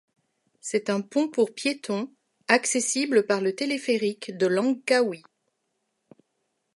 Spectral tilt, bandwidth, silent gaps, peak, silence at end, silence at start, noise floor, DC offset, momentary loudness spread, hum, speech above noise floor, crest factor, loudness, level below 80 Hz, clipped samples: -3.5 dB/octave; 11.5 kHz; none; -4 dBFS; 1.6 s; 0.65 s; -77 dBFS; under 0.1%; 9 LU; none; 52 dB; 22 dB; -25 LUFS; -82 dBFS; under 0.1%